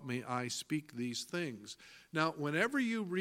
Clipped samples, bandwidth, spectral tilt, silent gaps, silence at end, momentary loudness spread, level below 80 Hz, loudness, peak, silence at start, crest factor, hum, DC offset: under 0.1%; 16.5 kHz; -4.5 dB/octave; none; 0 s; 11 LU; -80 dBFS; -37 LUFS; -14 dBFS; 0 s; 22 dB; none; under 0.1%